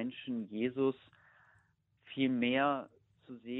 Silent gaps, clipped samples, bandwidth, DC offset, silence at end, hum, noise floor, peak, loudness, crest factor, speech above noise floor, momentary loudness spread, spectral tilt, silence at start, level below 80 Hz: none; under 0.1%; 4.1 kHz; under 0.1%; 0 s; none; -72 dBFS; -18 dBFS; -34 LUFS; 18 dB; 38 dB; 20 LU; -8.5 dB/octave; 0 s; -78 dBFS